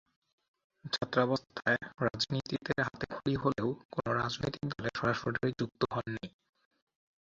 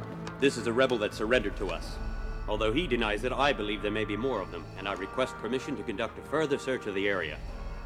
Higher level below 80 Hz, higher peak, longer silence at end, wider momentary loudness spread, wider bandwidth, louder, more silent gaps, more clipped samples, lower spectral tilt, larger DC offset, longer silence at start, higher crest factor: second, -60 dBFS vs -42 dBFS; about the same, -12 dBFS vs -12 dBFS; first, 0.95 s vs 0 s; second, 6 LU vs 11 LU; second, 7.8 kHz vs 14.5 kHz; second, -34 LUFS vs -31 LUFS; first, 3.85-3.89 s vs none; neither; about the same, -5.5 dB/octave vs -5 dB/octave; neither; first, 0.85 s vs 0 s; about the same, 22 dB vs 20 dB